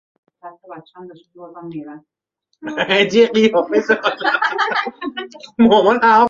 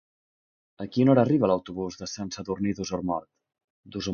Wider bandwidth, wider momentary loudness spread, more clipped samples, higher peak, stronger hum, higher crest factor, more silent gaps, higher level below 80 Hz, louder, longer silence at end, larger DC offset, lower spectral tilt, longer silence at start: about the same, 7.4 kHz vs 7 kHz; first, 21 LU vs 14 LU; neither; first, 0 dBFS vs -6 dBFS; neither; second, 16 dB vs 22 dB; second, none vs 3.64-3.83 s; about the same, -58 dBFS vs -56 dBFS; first, -15 LUFS vs -26 LUFS; about the same, 0 s vs 0 s; neither; second, -5 dB/octave vs -6.5 dB/octave; second, 0.45 s vs 0.8 s